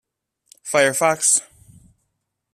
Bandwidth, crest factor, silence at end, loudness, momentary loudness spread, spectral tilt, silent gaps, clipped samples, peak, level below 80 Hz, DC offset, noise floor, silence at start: 15.5 kHz; 20 dB; 1.1 s; -17 LUFS; 7 LU; -1.5 dB/octave; none; under 0.1%; -2 dBFS; -64 dBFS; under 0.1%; -75 dBFS; 0.65 s